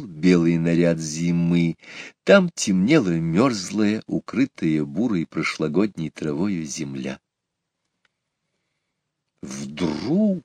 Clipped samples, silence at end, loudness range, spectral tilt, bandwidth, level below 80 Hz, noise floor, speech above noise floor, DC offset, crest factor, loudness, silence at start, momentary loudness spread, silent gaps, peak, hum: under 0.1%; 0.05 s; 13 LU; -6 dB/octave; 10 kHz; -56 dBFS; -81 dBFS; 60 dB; under 0.1%; 22 dB; -22 LUFS; 0 s; 14 LU; none; 0 dBFS; none